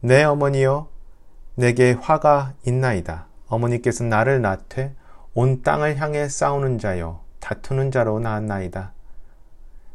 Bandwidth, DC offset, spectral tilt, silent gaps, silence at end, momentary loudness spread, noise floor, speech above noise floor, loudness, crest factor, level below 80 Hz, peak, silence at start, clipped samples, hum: 11.5 kHz; under 0.1%; -6.5 dB/octave; none; 0 s; 15 LU; -41 dBFS; 21 dB; -21 LUFS; 20 dB; -40 dBFS; 0 dBFS; 0 s; under 0.1%; none